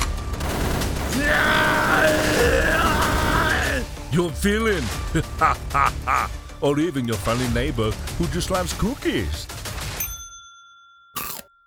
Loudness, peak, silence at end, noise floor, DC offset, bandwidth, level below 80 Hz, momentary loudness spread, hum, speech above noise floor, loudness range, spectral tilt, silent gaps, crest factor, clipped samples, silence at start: -22 LUFS; -4 dBFS; 0.25 s; -50 dBFS; under 0.1%; over 20 kHz; -32 dBFS; 12 LU; none; 28 dB; 7 LU; -4.5 dB/octave; none; 18 dB; under 0.1%; 0 s